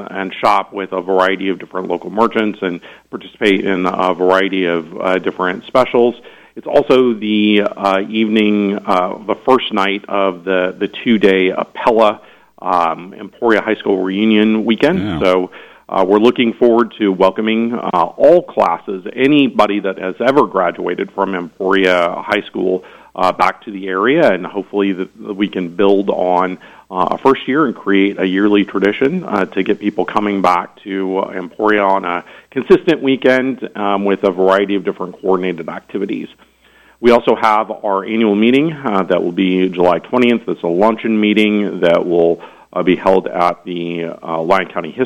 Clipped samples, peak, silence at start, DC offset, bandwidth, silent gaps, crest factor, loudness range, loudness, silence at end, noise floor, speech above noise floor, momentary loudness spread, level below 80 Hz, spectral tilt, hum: under 0.1%; 0 dBFS; 0 s; under 0.1%; 11 kHz; none; 14 dB; 3 LU; -15 LUFS; 0 s; -49 dBFS; 34 dB; 10 LU; -52 dBFS; -6.5 dB/octave; none